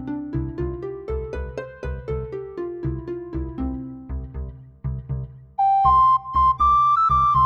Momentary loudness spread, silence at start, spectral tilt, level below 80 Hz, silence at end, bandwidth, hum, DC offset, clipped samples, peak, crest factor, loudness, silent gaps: 17 LU; 0 s; -8.5 dB/octave; -34 dBFS; 0 s; 7 kHz; none; under 0.1%; under 0.1%; -6 dBFS; 16 dB; -22 LUFS; none